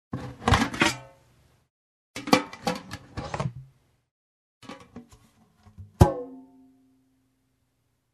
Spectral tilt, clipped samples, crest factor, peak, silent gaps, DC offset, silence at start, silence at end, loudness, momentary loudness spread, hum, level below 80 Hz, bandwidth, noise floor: -5 dB/octave; under 0.1%; 28 dB; -2 dBFS; 1.70-2.14 s, 4.11-4.61 s; under 0.1%; 0.15 s; 1.7 s; -26 LUFS; 24 LU; none; -42 dBFS; 13 kHz; -73 dBFS